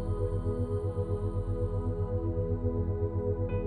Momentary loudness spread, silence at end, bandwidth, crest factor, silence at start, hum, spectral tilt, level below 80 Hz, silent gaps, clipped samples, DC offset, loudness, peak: 1 LU; 0 s; 3.3 kHz; 12 dB; 0 s; none; -10.5 dB/octave; -38 dBFS; none; under 0.1%; under 0.1%; -32 LUFS; -18 dBFS